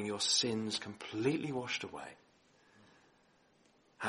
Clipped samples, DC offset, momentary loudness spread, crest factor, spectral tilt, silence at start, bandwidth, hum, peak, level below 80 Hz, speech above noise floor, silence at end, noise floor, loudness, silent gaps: under 0.1%; under 0.1%; 16 LU; 22 dB; -3 dB/octave; 0 s; 11.5 kHz; none; -16 dBFS; -76 dBFS; 33 dB; 0 s; -70 dBFS; -35 LUFS; none